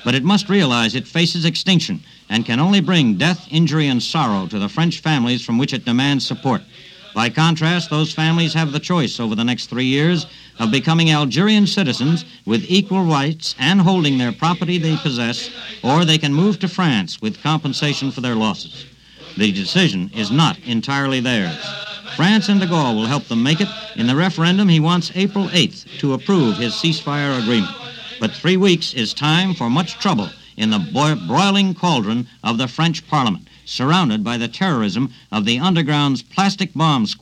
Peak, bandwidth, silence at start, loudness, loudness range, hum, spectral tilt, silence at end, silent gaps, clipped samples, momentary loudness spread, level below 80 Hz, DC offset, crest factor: -2 dBFS; 10.5 kHz; 0 s; -17 LUFS; 2 LU; none; -5.5 dB/octave; 0.05 s; none; under 0.1%; 8 LU; -56 dBFS; under 0.1%; 16 dB